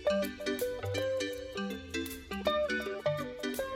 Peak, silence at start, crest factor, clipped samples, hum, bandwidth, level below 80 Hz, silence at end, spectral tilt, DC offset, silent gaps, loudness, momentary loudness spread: -16 dBFS; 0 s; 18 dB; under 0.1%; none; 16 kHz; -58 dBFS; 0 s; -4.5 dB/octave; under 0.1%; none; -35 LUFS; 6 LU